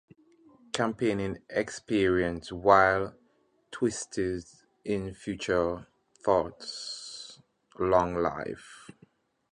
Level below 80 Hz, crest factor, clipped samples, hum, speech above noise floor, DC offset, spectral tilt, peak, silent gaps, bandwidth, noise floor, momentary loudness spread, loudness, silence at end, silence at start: -54 dBFS; 24 dB; under 0.1%; none; 40 dB; under 0.1%; -5 dB/octave; -6 dBFS; none; 11 kHz; -68 dBFS; 16 LU; -29 LUFS; 0.7 s; 0.75 s